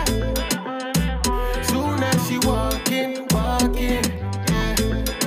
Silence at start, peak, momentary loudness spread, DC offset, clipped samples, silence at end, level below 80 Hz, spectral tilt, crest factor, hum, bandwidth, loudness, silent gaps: 0 s; -10 dBFS; 3 LU; under 0.1%; under 0.1%; 0 s; -28 dBFS; -4.5 dB/octave; 12 dB; none; 16.5 kHz; -22 LUFS; none